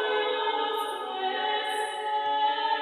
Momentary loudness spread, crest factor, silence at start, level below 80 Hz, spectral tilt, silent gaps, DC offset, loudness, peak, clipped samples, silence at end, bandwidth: 5 LU; 14 dB; 0 s; -88 dBFS; -0.5 dB/octave; none; under 0.1%; -28 LUFS; -14 dBFS; under 0.1%; 0 s; 14 kHz